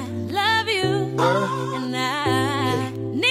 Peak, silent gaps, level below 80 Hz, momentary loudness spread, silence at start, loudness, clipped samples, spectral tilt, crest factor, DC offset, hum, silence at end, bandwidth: -6 dBFS; none; -56 dBFS; 6 LU; 0 s; -22 LUFS; under 0.1%; -5 dB/octave; 16 dB; under 0.1%; none; 0 s; 16 kHz